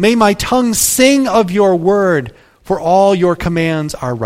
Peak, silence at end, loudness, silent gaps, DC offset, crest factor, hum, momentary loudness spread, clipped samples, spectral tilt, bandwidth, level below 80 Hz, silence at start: 0 dBFS; 0 s; -12 LUFS; none; under 0.1%; 12 dB; none; 9 LU; under 0.1%; -4.5 dB/octave; 16.5 kHz; -38 dBFS; 0 s